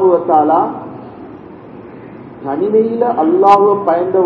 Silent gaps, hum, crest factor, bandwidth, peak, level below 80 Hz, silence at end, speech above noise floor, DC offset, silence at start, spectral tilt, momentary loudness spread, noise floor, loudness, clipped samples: none; none; 14 dB; 8 kHz; 0 dBFS; -54 dBFS; 0 s; 22 dB; under 0.1%; 0 s; -8.5 dB/octave; 24 LU; -33 dBFS; -12 LUFS; 0.3%